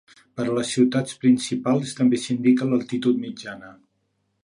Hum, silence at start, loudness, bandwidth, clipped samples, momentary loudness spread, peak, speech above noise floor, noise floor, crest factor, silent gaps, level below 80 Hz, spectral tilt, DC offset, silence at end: none; 0.35 s; -22 LUFS; 11 kHz; under 0.1%; 15 LU; -6 dBFS; 50 dB; -72 dBFS; 16 dB; none; -68 dBFS; -5.5 dB/octave; under 0.1%; 0.7 s